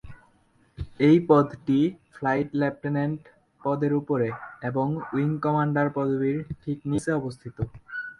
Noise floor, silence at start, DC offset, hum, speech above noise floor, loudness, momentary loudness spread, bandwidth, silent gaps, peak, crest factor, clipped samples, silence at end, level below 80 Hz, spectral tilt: -62 dBFS; 0.05 s; under 0.1%; none; 38 dB; -26 LUFS; 14 LU; 11.5 kHz; none; -6 dBFS; 20 dB; under 0.1%; 0.05 s; -52 dBFS; -8 dB/octave